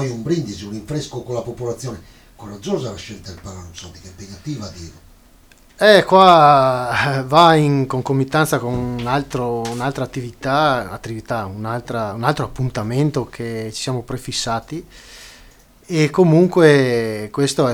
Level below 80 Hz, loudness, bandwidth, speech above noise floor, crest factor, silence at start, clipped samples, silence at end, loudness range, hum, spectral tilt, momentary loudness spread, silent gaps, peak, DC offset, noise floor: -46 dBFS; -17 LUFS; 19 kHz; 31 dB; 18 dB; 0 s; under 0.1%; 0 s; 16 LU; none; -5.5 dB/octave; 22 LU; none; 0 dBFS; under 0.1%; -49 dBFS